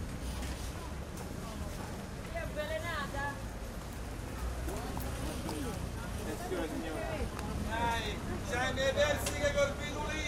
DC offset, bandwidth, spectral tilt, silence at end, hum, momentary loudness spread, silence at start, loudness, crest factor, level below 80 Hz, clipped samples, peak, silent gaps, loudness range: under 0.1%; 16 kHz; -4.5 dB/octave; 0 s; none; 11 LU; 0 s; -37 LUFS; 18 dB; -44 dBFS; under 0.1%; -18 dBFS; none; 6 LU